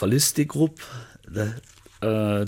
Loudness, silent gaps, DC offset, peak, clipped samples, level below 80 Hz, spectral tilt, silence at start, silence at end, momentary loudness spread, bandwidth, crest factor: -24 LUFS; none; under 0.1%; -8 dBFS; under 0.1%; -56 dBFS; -4.5 dB/octave; 0 s; 0 s; 20 LU; 17 kHz; 18 dB